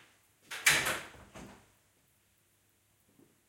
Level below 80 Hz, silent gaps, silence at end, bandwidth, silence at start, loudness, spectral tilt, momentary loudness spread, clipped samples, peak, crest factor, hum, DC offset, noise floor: -66 dBFS; none; 1.95 s; 17 kHz; 0.5 s; -29 LUFS; -0.5 dB/octave; 26 LU; under 0.1%; -10 dBFS; 28 dB; none; under 0.1%; -71 dBFS